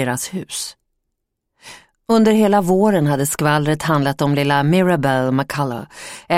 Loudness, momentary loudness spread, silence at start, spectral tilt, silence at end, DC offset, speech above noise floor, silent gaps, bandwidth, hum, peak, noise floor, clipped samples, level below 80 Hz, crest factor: -17 LUFS; 12 LU; 0 s; -5.5 dB/octave; 0 s; under 0.1%; 59 dB; none; 16.5 kHz; none; -2 dBFS; -75 dBFS; under 0.1%; -52 dBFS; 16 dB